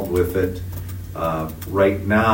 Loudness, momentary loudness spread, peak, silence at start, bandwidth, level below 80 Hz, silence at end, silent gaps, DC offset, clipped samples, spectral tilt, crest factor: -22 LUFS; 13 LU; -4 dBFS; 0 s; 16.5 kHz; -38 dBFS; 0 s; none; under 0.1%; under 0.1%; -7 dB/octave; 16 dB